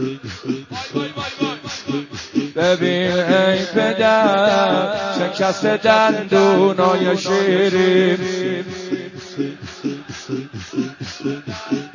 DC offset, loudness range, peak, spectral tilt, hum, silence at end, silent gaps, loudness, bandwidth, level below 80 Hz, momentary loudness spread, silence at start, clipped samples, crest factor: under 0.1%; 8 LU; 0 dBFS; -5 dB/octave; none; 0.05 s; none; -18 LUFS; 7.4 kHz; -54 dBFS; 13 LU; 0 s; under 0.1%; 18 dB